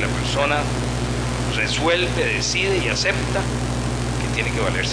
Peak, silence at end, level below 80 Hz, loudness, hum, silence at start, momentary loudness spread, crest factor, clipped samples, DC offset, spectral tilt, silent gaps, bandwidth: -6 dBFS; 0 s; -30 dBFS; -21 LUFS; 60 Hz at -25 dBFS; 0 s; 5 LU; 16 dB; under 0.1%; under 0.1%; -4 dB/octave; none; 10.5 kHz